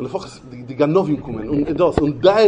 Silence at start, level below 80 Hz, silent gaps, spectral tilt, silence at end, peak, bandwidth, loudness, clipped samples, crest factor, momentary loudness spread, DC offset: 0 s; -40 dBFS; none; -7.5 dB/octave; 0 s; 0 dBFS; 10 kHz; -18 LUFS; under 0.1%; 18 dB; 17 LU; under 0.1%